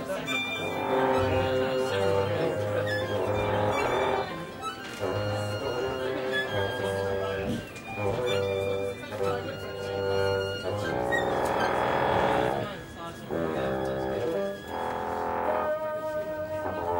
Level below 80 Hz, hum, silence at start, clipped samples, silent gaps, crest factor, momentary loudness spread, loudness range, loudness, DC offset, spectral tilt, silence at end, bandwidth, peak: -52 dBFS; none; 0 s; under 0.1%; none; 18 dB; 8 LU; 3 LU; -29 LUFS; under 0.1%; -5.5 dB/octave; 0 s; 16.5 kHz; -12 dBFS